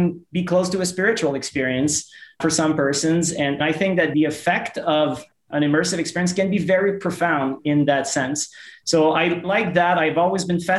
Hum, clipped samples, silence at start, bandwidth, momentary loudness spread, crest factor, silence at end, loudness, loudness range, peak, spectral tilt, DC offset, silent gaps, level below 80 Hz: none; under 0.1%; 0 s; 12.5 kHz; 6 LU; 16 dB; 0 s; -20 LUFS; 1 LU; -4 dBFS; -4.5 dB/octave; under 0.1%; none; -58 dBFS